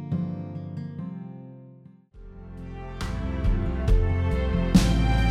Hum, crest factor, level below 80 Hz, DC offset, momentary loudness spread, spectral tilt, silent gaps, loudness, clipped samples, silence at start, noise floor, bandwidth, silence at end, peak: none; 20 dB; -28 dBFS; under 0.1%; 21 LU; -6.5 dB/octave; none; -26 LUFS; under 0.1%; 0 s; -50 dBFS; 13.5 kHz; 0 s; -6 dBFS